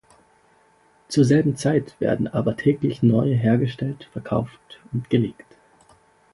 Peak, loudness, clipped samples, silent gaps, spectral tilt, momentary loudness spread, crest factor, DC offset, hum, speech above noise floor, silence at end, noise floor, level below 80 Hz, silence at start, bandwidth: -4 dBFS; -22 LUFS; under 0.1%; none; -7.5 dB/octave; 12 LU; 18 dB; under 0.1%; none; 37 dB; 1 s; -58 dBFS; -54 dBFS; 1.1 s; 11.5 kHz